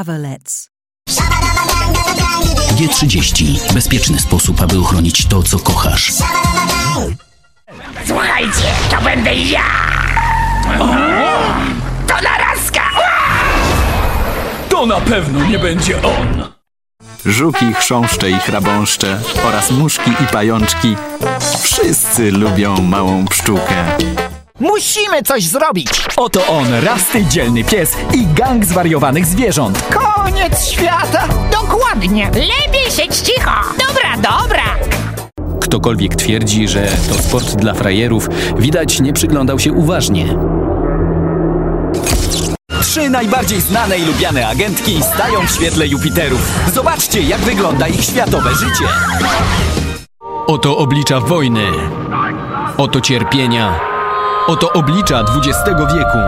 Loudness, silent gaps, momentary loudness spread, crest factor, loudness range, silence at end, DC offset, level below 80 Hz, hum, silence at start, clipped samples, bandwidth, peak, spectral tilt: -12 LUFS; none; 5 LU; 12 dB; 2 LU; 0 s; under 0.1%; -22 dBFS; none; 0 s; under 0.1%; 16.5 kHz; 0 dBFS; -4 dB/octave